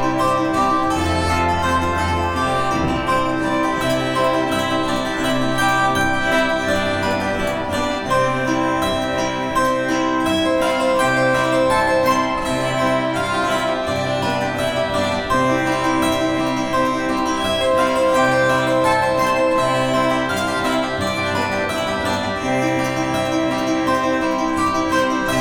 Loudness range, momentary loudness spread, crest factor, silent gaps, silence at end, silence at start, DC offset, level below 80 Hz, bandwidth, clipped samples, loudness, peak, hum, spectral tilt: 2 LU; 4 LU; 14 dB; none; 0 s; 0 s; under 0.1%; -38 dBFS; 19.5 kHz; under 0.1%; -18 LUFS; -4 dBFS; none; -4.5 dB/octave